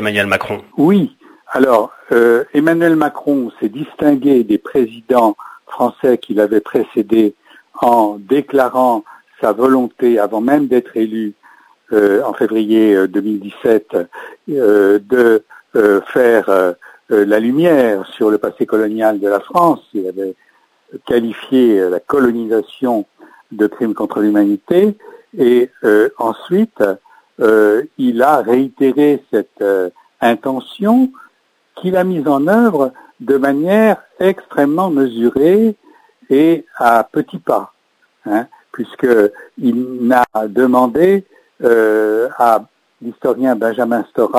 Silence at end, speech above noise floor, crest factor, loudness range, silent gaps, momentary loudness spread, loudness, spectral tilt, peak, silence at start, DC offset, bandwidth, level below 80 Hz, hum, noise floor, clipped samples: 0 s; 46 dB; 14 dB; 3 LU; none; 9 LU; -14 LUFS; -7 dB/octave; 0 dBFS; 0 s; under 0.1%; 16 kHz; -58 dBFS; none; -59 dBFS; under 0.1%